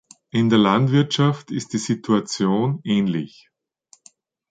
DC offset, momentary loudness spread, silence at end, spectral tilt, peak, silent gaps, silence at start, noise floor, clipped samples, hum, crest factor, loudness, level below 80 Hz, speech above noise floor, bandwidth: under 0.1%; 10 LU; 1.25 s; -6 dB/octave; -2 dBFS; none; 0.35 s; -57 dBFS; under 0.1%; none; 18 dB; -20 LUFS; -60 dBFS; 37 dB; 9.2 kHz